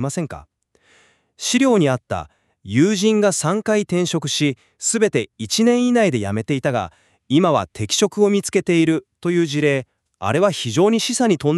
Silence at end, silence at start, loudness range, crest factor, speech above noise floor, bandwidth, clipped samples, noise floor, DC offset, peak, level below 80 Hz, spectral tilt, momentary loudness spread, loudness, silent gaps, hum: 0 s; 0 s; 1 LU; 16 dB; 39 dB; 13.5 kHz; under 0.1%; -57 dBFS; under 0.1%; -4 dBFS; -56 dBFS; -4.5 dB/octave; 9 LU; -19 LUFS; none; none